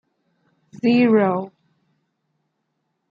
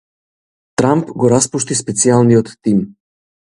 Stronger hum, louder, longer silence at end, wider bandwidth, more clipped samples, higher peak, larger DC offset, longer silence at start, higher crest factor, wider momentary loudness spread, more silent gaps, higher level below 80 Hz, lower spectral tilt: neither; second, -18 LUFS vs -14 LUFS; first, 1.65 s vs 0.6 s; second, 5.2 kHz vs 11.5 kHz; neither; second, -6 dBFS vs 0 dBFS; neither; about the same, 0.85 s vs 0.8 s; about the same, 16 dB vs 16 dB; first, 13 LU vs 7 LU; neither; second, -74 dBFS vs -50 dBFS; first, -8.5 dB/octave vs -5.5 dB/octave